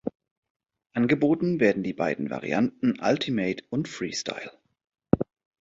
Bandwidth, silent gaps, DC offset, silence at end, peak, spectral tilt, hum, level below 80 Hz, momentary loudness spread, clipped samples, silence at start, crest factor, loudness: 7.8 kHz; 0.15-0.20 s, 0.31-0.43 s, 0.50-0.60 s; under 0.1%; 0.35 s; -2 dBFS; -6 dB/octave; none; -58 dBFS; 12 LU; under 0.1%; 0.05 s; 24 dB; -26 LUFS